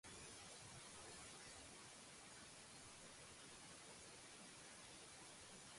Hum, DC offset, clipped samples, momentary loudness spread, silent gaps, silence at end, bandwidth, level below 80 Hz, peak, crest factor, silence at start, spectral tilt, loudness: none; under 0.1%; under 0.1%; 2 LU; none; 0 s; 11.5 kHz; -78 dBFS; -46 dBFS; 14 dB; 0.05 s; -2 dB/octave; -58 LUFS